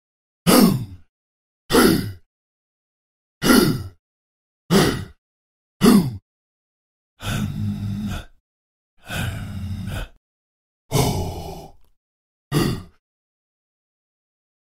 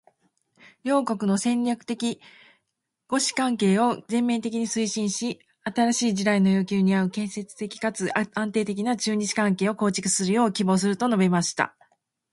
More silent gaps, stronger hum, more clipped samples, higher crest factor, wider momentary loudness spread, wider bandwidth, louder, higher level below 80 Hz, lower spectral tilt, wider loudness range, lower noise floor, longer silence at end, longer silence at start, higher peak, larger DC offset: first, 1.09-1.69 s, 2.26-3.41 s, 3.99-4.69 s, 5.18-5.80 s, 6.22-7.17 s, 8.40-8.97 s, 10.17-10.89 s, 11.97-12.51 s vs none; neither; neither; about the same, 22 dB vs 20 dB; first, 19 LU vs 8 LU; first, 16.5 kHz vs 11.5 kHz; first, -20 LUFS vs -24 LUFS; first, -40 dBFS vs -68 dBFS; about the same, -5 dB/octave vs -4.5 dB/octave; first, 10 LU vs 3 LU; first, under -90 dBFS vs -80 dBFS; first, 1.85 s vs 0.65 s; second, 0.45 s vs 0.85 s; about the same, -2 dBFS vs -4 dBFS; neither